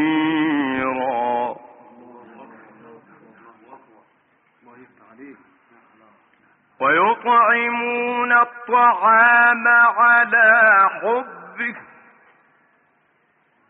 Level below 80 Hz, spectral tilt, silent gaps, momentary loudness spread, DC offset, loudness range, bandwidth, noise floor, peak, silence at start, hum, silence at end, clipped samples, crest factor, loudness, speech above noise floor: -70 dBFS; -1.5 dB/octave; none; 15 LU; under 0.1%; 14 LU; 4 kHz; -63 dBFS; -4 dBFS; 0 s; none; 1.9 s; under 0.1%; 16 dB; -16 LUFS; 48 dB